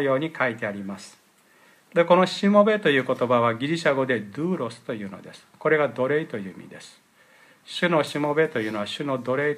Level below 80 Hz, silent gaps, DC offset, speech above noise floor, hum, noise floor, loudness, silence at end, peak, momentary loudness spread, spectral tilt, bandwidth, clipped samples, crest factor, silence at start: -74 dBFS; none; under 0.1%; 34 dB; none; -57 dBFS; -23 LUFS; 0 s; -4 dBFS; 16 LU; -6 dB/octave; 14.5 kHz; under 0.1%; 20 dB; 0 s